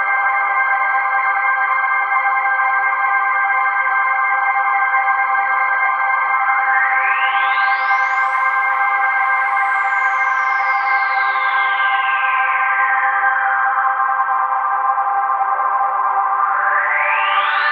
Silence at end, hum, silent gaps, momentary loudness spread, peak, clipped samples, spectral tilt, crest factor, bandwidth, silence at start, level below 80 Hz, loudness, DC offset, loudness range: 0 s; none; none; 2 LU; -2 dBFS; under 0.1%; 1 dB/octave; 14 dB; 7.4 kHz; 0 s; under -90 dBFS; -15 LUFS; under 0.1%; 1 LU